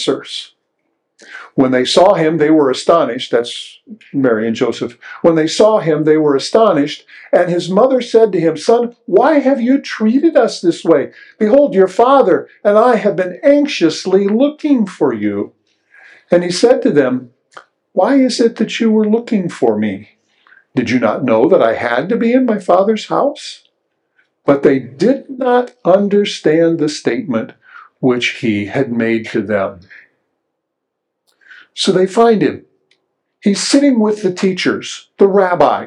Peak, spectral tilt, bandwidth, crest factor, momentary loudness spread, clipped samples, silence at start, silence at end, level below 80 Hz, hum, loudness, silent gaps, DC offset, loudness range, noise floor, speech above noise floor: 0 dBFS; -5.5 dB/octave; 11 kHz; 14 dB; 10 LU; under 0.1%; 0 s; 0 s; -60 dBFS; none; -13 LUFS; none; under 0.1%; 5 LU; -74 dBFS; 62 dB